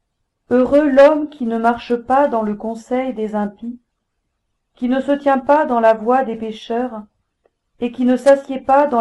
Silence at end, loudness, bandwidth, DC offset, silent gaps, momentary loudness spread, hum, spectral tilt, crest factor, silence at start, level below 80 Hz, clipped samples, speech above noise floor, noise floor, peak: 0 s; -16 LUFS; 11.5 kHz; under 0.1%; none; 13 LU; none; -6.5 dB/octave; 16 dB; 0.5 s; -52 dBFS; under 0.1%; 57 dB; -72 dBFS; -2 dBFS